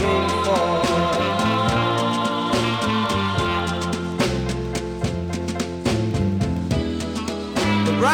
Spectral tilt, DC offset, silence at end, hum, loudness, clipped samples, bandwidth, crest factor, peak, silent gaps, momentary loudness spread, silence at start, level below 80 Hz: -5.5 dB/octave; under 0.1%; 0 s; none; -22 LUFS; under 0.1%; 17.5 kHz; 16 dB; -6 dBFS; none; 6 LU; 0 s; -38 dBFS